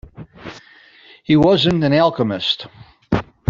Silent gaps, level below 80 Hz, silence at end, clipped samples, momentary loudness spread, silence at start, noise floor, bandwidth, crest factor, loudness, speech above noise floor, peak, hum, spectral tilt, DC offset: none; -44 dBFS; 0.3 s; under 0.1%; 23 LU; 0.2 s; -47 dBFS; 7.4 kHz; 16 dB; -16 LUFS; 31 dB; -2 dBFS; none; -7 dB/octave; under 0.1%